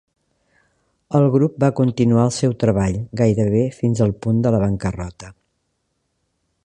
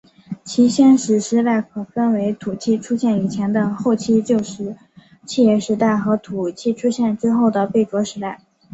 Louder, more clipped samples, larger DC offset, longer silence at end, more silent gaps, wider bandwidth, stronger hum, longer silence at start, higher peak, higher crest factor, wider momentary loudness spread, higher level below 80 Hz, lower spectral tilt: about the same, -18 LUFS vs -18 LUFS; neither; neither; first, 1.35 s vs 0.4 s; neither; first, 10.5 kHz vs 8.2 kHz; neither; first, 1.1 s vs 0.3 s; about the same, -2 dBFS vs -4 dBFS; about the same, 18 dB vs 14 dB; second, 6 LU vs 12 LU; first, -42 dBFS vs -60 dBFS; first, -7.5 dB/octave vs -6 dB/octave